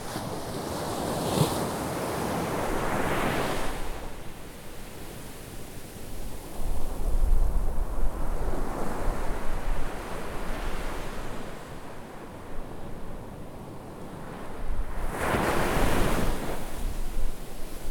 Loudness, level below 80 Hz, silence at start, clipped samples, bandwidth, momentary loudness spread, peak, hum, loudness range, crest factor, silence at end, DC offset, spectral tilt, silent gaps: -33 LUFS; -30 dBFS; 0 s; under 0.1%; 18 kHz; 16 LU; -10 dBFS; none; 11 LU; 18 dB; 0 s; under 0.1%; -5 dB/octave; none